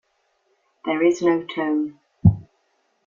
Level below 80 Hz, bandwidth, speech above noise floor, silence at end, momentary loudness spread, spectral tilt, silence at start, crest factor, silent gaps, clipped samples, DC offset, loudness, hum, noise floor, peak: -44 dBFS; 7.4 kHz; 47 dB; 0.65 s; 13 LU; -7.5 dB/octave; 0.85 s; 20 dB; none; under 0.1%; under 0.1%; -22 LUFS; none; -68 dBFS; -2 dBFS